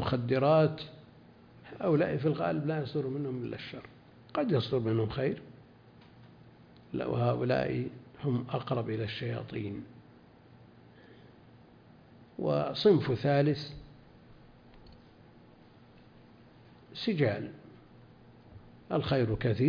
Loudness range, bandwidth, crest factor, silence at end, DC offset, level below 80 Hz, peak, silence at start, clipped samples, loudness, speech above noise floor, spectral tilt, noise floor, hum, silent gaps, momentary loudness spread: 8 LU; 5.2 kHz; 20 dB; 0 s; under 0.1%; -60 dBFS; -12 dBFS; 0 s; under 0.1%; -31 LUFS; 27 dB; -9 dB/octave; -57 dBFS; none; none; 18 LU